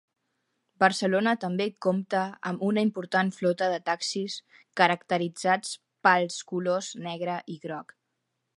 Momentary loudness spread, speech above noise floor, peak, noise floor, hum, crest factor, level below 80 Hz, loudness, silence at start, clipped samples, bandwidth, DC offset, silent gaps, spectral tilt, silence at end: 12 LU; 53 dB; -4 dBFS; -80 dBFS; none; 24 dB; -78 dBFS; -27 LUFS; 0.8 s; under 0.1%; 11.5 kHz; under 0.1%; none; -4.5 dB/octave; 0.75 s